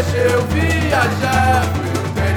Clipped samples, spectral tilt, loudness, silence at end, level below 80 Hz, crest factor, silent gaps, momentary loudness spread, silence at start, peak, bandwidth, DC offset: under 0.1%; -5.5 dB/octave; -16 LUFS; 0 s; -30 dBFS; 14 dB; none; 5 LU; 0 s; -2 dBFS; 18 kHz; under 0.1%